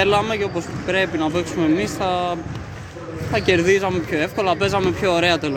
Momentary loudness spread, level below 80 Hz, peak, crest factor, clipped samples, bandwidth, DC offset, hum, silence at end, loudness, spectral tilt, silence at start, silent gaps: 13 LU; -44 dBFS; -4 dBFS; 16 dB; under 0.1%; 16.5 kHz; under 0.1%; none; 0 s; -20 LUFS; -5 dB/octave; 0 s; none